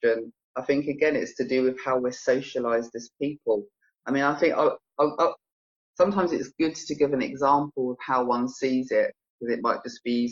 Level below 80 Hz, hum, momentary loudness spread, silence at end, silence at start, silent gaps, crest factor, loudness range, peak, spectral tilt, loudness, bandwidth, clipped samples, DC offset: -66 dBFS; none; 8 LU; 0 s; 0 s; 0.44-0.54 s, 5.52-5.94 s, 9.30-9.39 s; 18 dB; 2 LU; -8 dBFS; -5.5 dB/octave; -26 LUFS; 7.6 kHz; under 0.1%; under 0.1%